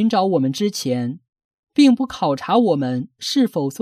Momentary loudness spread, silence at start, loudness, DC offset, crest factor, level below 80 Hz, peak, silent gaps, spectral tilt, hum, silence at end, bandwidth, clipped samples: 9 LU; 0 s; -19 LUFS; under 0.1%; 16 dB; -62 dBFS; -4 dBFS; 1.29-1.33 s, 1.44-1.63 s; -5.5 dB/octave; none; 0.05 s; 15 kHz; under 0.1%